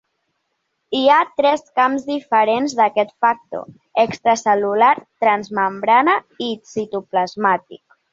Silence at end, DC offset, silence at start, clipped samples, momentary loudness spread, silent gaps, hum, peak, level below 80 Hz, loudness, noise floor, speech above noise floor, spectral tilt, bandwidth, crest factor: 0.35 s; under 0.1%; 0.9 s; under 0.1%; 11 LU; none; none; -2 dBFS; -66 dBFS; -18 LUFS; -72 dBFS; 55 dB; -4 dB/octave; 7.8 kHz; 16 dB